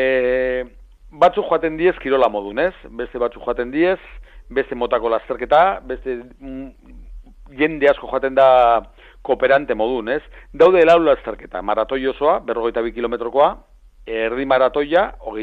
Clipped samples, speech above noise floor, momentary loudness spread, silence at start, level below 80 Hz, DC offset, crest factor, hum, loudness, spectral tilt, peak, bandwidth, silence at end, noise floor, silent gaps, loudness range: under 0.1%; 25 dB; 14 LU; 0 s; -42 dBFS; under 0.1%; 16 dB; none; -18 LUFS; -6.5 dB/octave; -2 dBFS; 7.8 kHz; 0 s; -43 dBFS; none; 5 LU